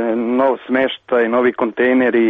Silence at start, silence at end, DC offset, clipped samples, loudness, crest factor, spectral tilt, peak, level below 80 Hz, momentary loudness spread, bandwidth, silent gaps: 0 s; 0 s; under 0.1%; under 0.1%; -16 LUFS; 10 dB; -7.5 dB/octave; -4 dBFS; -58 dBFS; 3 LU; 3.9 kHz; none